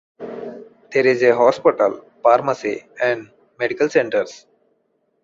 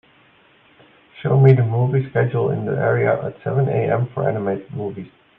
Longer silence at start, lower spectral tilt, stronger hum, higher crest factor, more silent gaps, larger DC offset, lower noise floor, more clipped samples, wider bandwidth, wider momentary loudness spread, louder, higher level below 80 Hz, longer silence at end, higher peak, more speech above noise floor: second, 0.2 s vs 1.15 s; second, -5 dB/octave vs -11.5 dB/octave; neither; about the same, 18 dB vs 18 dB; neither; neither; first, -67 dBFS vs -54 dBFS; neither; first, 7.6 kHz vs 3.7 kHz; about the same, 17 LU vs 15 LU; about the same, -18 LUFS vs -19 LUFS; second, -64 dBFS vs -56 dBFS; first, 0.85 s vs 0.3 s; about the same, -2 dBFS vs 0 dBFS; first, 49 dB vs 35 dB